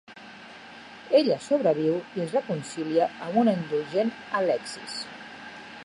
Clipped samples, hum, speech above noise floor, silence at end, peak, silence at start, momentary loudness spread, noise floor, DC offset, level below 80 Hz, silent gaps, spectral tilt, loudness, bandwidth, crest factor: under 0.1%; none; 20 dB; 0 s; -8 dBFS; 0.1 s; 21 LU; -45 dBFS; under 0.1%; -72 dBFS; none; -5.5 dB/octave; -26 LUFS; 11.5 kHz; 20 dB